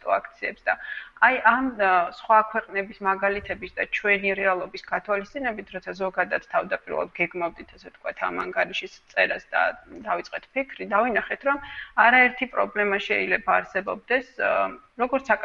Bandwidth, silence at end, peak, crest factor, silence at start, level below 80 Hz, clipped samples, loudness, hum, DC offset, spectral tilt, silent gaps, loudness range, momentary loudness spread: 7.4 kHz; 0 s; -4 dBFS; 20 dB; 0.05 s; -56 dBFS; under 0.1%; -24 LUFS; none; under 0.1%; -5 dB/octave; none; 6 LU; 10 LU